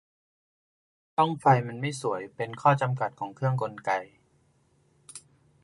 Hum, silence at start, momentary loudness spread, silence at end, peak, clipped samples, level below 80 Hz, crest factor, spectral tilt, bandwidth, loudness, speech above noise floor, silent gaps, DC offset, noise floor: none; 1.2 s; 18 LU; 0.45 s; -8 dBFS; under 0.1%; -72 dBFS; 22 dB; -6.5 dB/octave; 11.5 kHz; -27 LUFS; 40 dB; none; under 0.1%; -66 dBFS